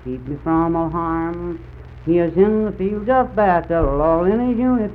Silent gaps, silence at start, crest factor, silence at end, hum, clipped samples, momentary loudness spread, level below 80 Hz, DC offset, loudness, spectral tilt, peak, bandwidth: none; 0 s; 16 dB; 0 s; none; under 0.1%; 12 LU; -34 dBFS; under 0.1%; -18 LUFS; -11 dB/octave; -4 dBFS; 4.5 kHz